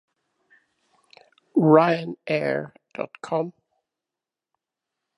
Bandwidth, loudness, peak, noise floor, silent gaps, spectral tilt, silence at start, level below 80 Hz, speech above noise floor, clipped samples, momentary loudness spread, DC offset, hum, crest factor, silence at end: 10.5 kHz; -23 LUFS; -2 dBFS; -88 dBFS; none; -8 dB/octave; 1.55 s; -76 dBFS; 67 dB; under 0.1%; 18 LU; under 0.1%; none; 24 dB; 1.65 s